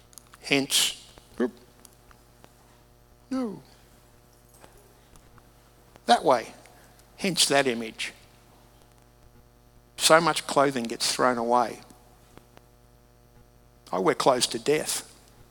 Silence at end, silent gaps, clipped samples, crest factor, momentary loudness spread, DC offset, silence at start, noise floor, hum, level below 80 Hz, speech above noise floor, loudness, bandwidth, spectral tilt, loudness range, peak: 0.45 s; none; under 0.1%; 26 dB; 18 LU; under 0.1%; 0.45 s; -57 dBFS; none; -60 dBFS; 32 dB; -25 LUFS; over 20 kHz; -2.5 dB/octave; 16 LU; -4 dBFS